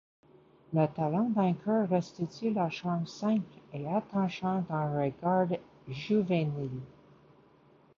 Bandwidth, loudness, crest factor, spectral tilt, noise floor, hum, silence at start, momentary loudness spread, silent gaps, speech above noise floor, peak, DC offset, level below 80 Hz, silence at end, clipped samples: 7.2 kHz; -31 LUFS; 18 dB; -8 dB/octave; -62 dBFS; none; 0.7 s; 10 LU; none; 31 dB; -14 dBFS; under 0.1%; -70 dBFS; 1.1 s; under 0.1%